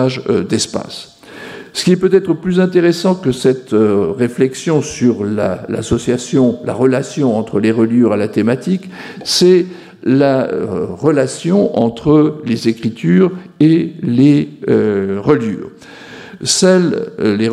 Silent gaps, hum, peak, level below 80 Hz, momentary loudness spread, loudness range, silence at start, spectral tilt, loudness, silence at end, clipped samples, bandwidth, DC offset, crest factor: none; none; 0 dBFS; -48 dBFS; 11 LU; 2 LU; 0 s; -5.5 dB/octave; -14 LUFS; 0 s; under 0.1%; 14 kHz; under 0.1%; 14 dB